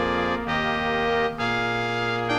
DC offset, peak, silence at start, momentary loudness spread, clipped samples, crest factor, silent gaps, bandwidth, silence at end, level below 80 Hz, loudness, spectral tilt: under 0.1%; -12 dBFS; 0 s; 2 LU; under 0.1%; 12 dB; none; 14 kHz; 0 s; -46 dBFS; -24 LUFS; -5.5 dB/octave